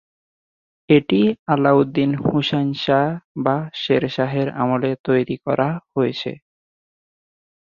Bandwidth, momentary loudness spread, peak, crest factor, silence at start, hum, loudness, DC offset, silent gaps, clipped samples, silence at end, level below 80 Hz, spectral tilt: 7 kHz; 7 LU; -2 dBFS; 18 dB; 0.9 s; none; -19 LUFS; under 0.1%; 1.39-1.46 s, 3.24-3.35 s, 4.99-5.04 s; under 0.1%; 1.3 s; -56 dBFS; -8 dB/octave